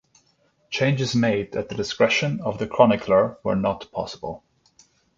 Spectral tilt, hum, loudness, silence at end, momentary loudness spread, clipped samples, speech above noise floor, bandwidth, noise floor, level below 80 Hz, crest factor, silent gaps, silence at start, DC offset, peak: -5.5 dB/octave; none; -22 LUFS; 0.8 s; 13 LU; under 0.1%; 42 dB; 7.8 kHz; -64 dBFS; -54 dBFS; 22 dB; none; 0.7 s; under 0.1%; -2 dBFS